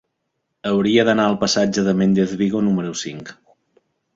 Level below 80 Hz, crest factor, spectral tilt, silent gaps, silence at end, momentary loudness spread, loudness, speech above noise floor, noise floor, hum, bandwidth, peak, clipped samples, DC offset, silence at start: -54 dBFS; 18 dB; -5 dB/octave; none; 0.85 s; 14 LU; -18 LUFS; 57 dB; -75 dBFS; none; 7.8 kHz; -2 dBFS; under 0.1%; under 0.1%; 0.65 s